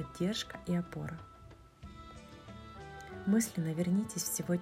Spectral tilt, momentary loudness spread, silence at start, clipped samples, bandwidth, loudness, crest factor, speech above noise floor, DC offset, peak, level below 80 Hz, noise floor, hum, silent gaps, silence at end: -5 dB/octave; 21 LU; 0 s; under 0.1%; 16 kHz; -35 LUFS; 18 dB; 22 dB; under 0.1%; -20 dBFS; -60 dBFS; -56 dBFS; none; none; 0 s